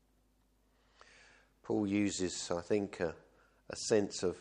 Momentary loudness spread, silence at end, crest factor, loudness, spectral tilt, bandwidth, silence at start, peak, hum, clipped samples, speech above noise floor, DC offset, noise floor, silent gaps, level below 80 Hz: 12 LU; 0 s; 20 dB; -35 LUFS; -4.5 dB/octave; 11 kHz; 1.65 s; -16 dBFS; none; under 0.1%; 38 dB; under 0.1%; -72 dBFS; none; -68 dBFS